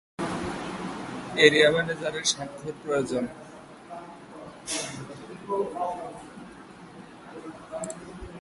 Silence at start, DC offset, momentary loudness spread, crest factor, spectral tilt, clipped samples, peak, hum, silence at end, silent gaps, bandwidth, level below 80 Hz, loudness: 0.2 s; under 0.1%; 24 LU; 26 dB; -3 dB/octave; under 0.1%; -4 dBFS; none; 0 s; none; 11.5 kHz; -58 dBFS; -27 LUFS